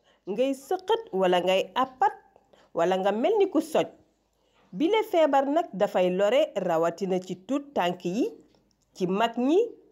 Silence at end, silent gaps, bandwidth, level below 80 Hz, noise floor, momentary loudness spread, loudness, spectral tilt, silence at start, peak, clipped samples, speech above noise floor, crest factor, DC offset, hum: 0.15 s; none; 16 kHz; -76 dBFS; -69 dBFS; 8 LU; -26 LUFS; -5.5 dB/octave; 0.25 s; -12 dBFS; under 0.1%; 44 dB; 14 dB; under 0.1%; none